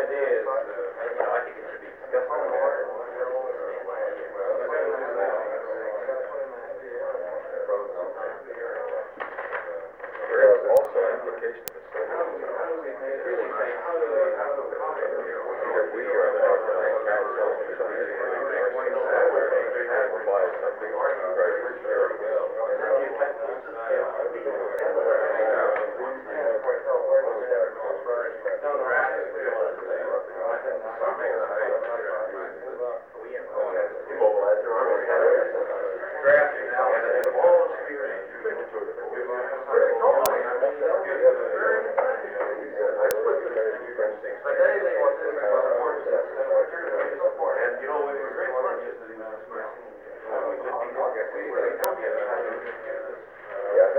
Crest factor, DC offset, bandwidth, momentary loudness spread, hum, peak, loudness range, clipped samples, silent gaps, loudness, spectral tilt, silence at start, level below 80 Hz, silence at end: 24 dB; under 0.1%; over 20 kHz; 11 LU; none; 0 dBFS; 6 LU; under 0.1%; none; -26 LUFS; -4 dB/octave; 0 s; -72 dBFS; 0 s